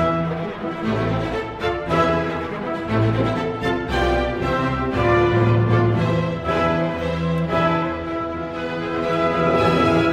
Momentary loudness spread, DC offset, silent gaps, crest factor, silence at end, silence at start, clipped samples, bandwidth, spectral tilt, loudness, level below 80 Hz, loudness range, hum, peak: 9 LU; under 0.1%; none; 14 dB; 0 s; 0 s; under 0.1%; 9.8 kHz; -7.5 dB/octave; -21 LUFS; -36 dBFS; 3 LU; none; -6 dBFS